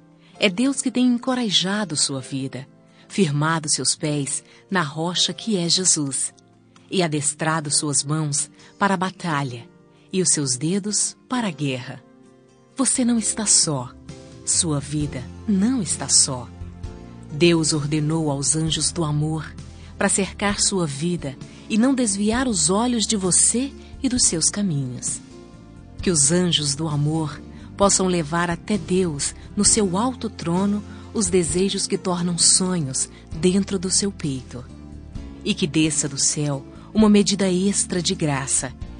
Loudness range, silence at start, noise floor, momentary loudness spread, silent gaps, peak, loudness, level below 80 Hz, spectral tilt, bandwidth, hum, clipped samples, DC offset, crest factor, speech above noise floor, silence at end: 3 LU; 0.35 s; -52 dBFS; 14 LU; none; 0 dBFS; -20 LUFS; -46 dBFS; -3.5 dB/octave; 10 kHz; none; under 0.1%; under 0.1%; 22 dB; 31 dB; 0 s